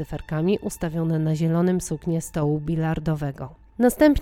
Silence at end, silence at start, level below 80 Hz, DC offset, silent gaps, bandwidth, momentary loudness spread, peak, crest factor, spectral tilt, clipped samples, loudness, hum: 0 s; 0 s; -44 dBFS; under 0.1%; none; 16.5 kHz; 8 LU; -4 dBFS; 20 dB; -7 dB/octave; under 0.1%; -24 LUFS; none